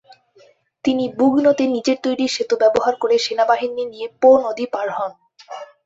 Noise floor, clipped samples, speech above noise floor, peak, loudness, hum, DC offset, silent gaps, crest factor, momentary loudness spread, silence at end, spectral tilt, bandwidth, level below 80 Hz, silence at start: -53 dBFS; under 0.1%; 36 dB; -2 dBFS; -18 LUFS; none; under 0.1%; none; 16 dB; 13 LU; 0.2 s; -4 dB/octave; 8 kHz; -62 dBFS; 0.1 s